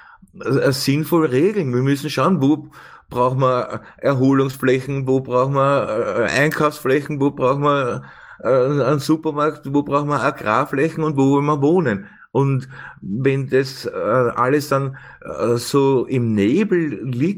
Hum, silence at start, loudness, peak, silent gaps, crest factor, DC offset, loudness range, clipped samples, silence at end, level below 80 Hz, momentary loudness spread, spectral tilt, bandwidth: none; 0.35 s; -18 LUFS; -2 dBFS; none; 16 dB; under 0.1%; 1 LU; under 0.1%; 0 s; -56 dBFS; 8 LU; -6.5 dB/octave; 17 kHz